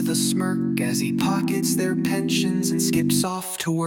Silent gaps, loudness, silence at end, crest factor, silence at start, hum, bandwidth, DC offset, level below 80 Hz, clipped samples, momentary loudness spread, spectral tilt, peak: none; -22 LUFS; 0 s; 14 dB; 0 s; none; 17.5 kHz; under 0.1%; -60 dBFS; under 0.1%; 2 LU; -4.5 dB/octave; -8 dBFS